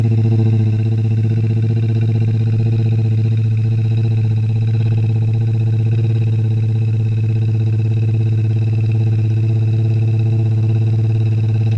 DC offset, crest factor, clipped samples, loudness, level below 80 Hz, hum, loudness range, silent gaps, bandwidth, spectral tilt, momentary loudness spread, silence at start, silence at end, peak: under 0.1%; 10 dB; under 0.1%; -16 LUFS; -42 dBFS; none; 1 LU; none; 5.2 kHz; -10 dB/octave; 1 LU; 0 s; 0 s; -4 dBFS